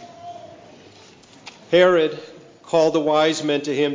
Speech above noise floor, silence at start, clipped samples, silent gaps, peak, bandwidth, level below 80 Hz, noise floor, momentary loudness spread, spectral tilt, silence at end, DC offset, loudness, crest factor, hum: 30 dB; 0 s; under 0.1%; none; -2 dBFS; 7.6 kHz; -66 dBFS; -47 dBFS; 23 LU; -4.5 dB/octave; 0 s; under 0.1%; -19 LUFS; 18 dB; none